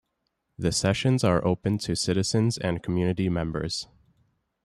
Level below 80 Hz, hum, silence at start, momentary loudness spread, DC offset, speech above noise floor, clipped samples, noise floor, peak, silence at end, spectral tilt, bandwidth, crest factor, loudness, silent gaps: -50 dBFS; none; 0.6 s; 8 LU; under 0.1%; 53 dB; under 0.1%; -78 dBFS; -10 dBFS; 0.8 s; -5.5 dB/octave; 13 kHz; 18 dB; -26 LUFS; none